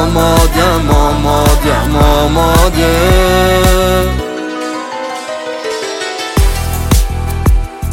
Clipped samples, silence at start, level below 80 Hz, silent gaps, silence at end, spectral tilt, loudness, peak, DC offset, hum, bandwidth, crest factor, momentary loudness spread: under 0.1%; 0 s; -16 dBFS; none; 0 s; -5 dB/octave; -12 LUFS; 0 dBFS; under 0.1%; none; 17 kHz; 10 dB; 10 LU